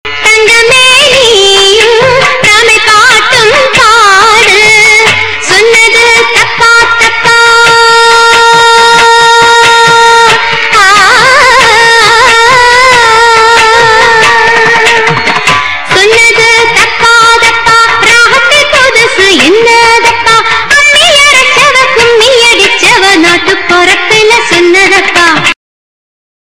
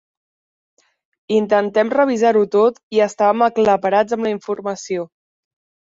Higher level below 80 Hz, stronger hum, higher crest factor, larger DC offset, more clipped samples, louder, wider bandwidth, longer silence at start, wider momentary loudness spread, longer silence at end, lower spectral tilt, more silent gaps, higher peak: first, -34 dBFS vs -64 dBFS; neither; second, 4 dB vs 16 dB; first, 4% vs under 0.1%; first, 10% vs under 0.1%; first, -2 LUFS vs -17 LUFS; first, over 20 kHz vs 7.8 kHz; second, 0.05 s vs 1.3 s; second, 3 LU vs 10 LU; about the same, 0.9 s vs 0.9 s; second, -1.5 dB/octave vs -5.5 dB/octave; second, none vs 2.83-2.90 s; about the same, 0 dBFS vs -2 dBFS